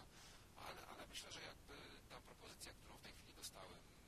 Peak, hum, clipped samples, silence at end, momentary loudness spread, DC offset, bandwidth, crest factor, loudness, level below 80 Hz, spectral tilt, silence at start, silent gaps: -40 dBFS; none; under 0.1%; 0 s; 7 LU; under 0.1%; 14 kHz; 20 dB; -57 LUFS; -70 dBFS; -2.5 dB/octave; 0 s; none